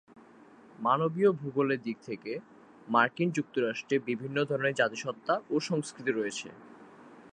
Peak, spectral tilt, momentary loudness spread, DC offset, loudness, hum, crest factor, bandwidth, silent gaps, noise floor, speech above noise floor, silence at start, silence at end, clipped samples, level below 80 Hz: -10 dBFS; -5.5 dB/octave; 11 LU; under 0.1%; -30 LUFS; none; 22 dB; 10 kHz; none; -55 dBFS; 25 dB; 0.15 s; 0.05 s; under 0.1%; -78 dBFS